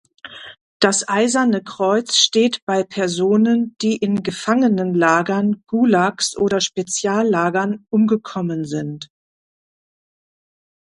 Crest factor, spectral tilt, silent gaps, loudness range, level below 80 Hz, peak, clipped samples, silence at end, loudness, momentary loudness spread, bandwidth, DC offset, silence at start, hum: 18 dB; -4 dB/octave; 0.61-0.80 s, 2.62-2.67 s; 4 LU; -62 dBFS; 0 dBFS; under 0.1%; 1.85 s; -18 LUFS; 9 LU; 11.5 kHz; under 0.1%; 0.25 s; none